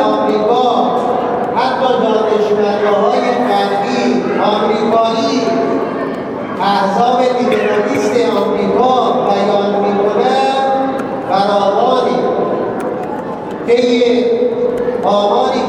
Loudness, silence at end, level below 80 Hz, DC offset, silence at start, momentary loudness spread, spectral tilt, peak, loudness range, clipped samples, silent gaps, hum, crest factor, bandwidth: -13 LUFS; 0 s; -52 dBFS; under 0.1%; 0 s; 6 LU; -5.5 dB/octave; 0 dBFS; 2 LU; under 0.1%; none; none; 12 dB; 11 kHz